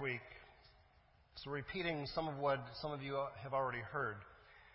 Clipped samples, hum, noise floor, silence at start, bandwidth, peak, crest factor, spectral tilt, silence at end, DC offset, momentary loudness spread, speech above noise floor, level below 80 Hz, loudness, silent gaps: under 0.1%; none; -70 dBFS; 0 s; 5.6 kHz; -26 dBFS; 18 dB; -3.5 dB/octave; 0 s; under 0.1%; 19 LU; 28 dB; -66 dBFS; -42 LUFS; none